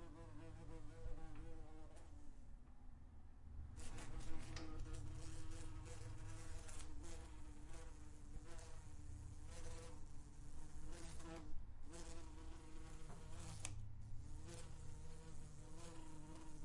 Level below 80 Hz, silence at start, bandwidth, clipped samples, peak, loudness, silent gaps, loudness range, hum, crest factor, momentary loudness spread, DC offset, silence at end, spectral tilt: -54 dBFS; 0 s; 11.5 kHz; under 0.1%; -26 dBFS; -58 LUFS; none; 4 LU; none; 24 dB; 7 LU; under 0.1%; 0 s; -5 dB/octave